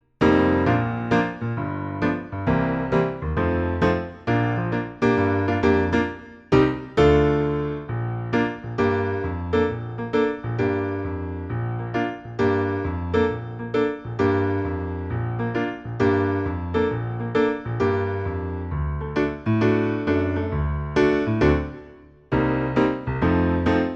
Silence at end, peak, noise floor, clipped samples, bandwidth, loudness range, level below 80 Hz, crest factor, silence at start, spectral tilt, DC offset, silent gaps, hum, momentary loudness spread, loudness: 0 s; -6 dBFS; -46 dBFS; under 0.1%; 7.8 kHz; 4 LU; -38 dBFS; 18 dB; 0.2 s; -8.5 dB/octave; under 0.1%; none; none; 8 LU; -23 LUFS